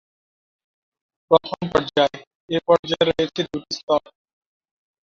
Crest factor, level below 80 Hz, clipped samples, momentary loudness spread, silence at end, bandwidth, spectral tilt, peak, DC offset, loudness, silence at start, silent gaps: 22 dB; -56 dBFS; under 0.1%; 8 LU; 1.1 s; 7.4 kHz; -5 dB/octave; -2 dBFS; under 0.1%; -21 LUFS; 1.3 s; 2.27-2.48 s, 2.79-2.83 s, 3.83-3.87 s